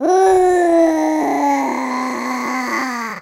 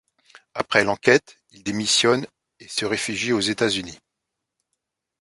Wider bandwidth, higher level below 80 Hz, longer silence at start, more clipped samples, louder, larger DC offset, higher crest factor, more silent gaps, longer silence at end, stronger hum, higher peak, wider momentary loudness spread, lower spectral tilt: first, 16 kHz vs 11.5 kHz; first, -52 dBFS vs -60 dBFS; second, 0 s vs 0.55 s; neither; first, -16 LUFS vs -21 LUFS; neither; second, 12 dB vs 24 dB; neither; second, 0 s vs 1.25 s; neither; second, -4 dBFS vs 0 dBFS; second, 8 LU vs 14 LU; about the same, -3.5 dB/octave vs -3 dB/octave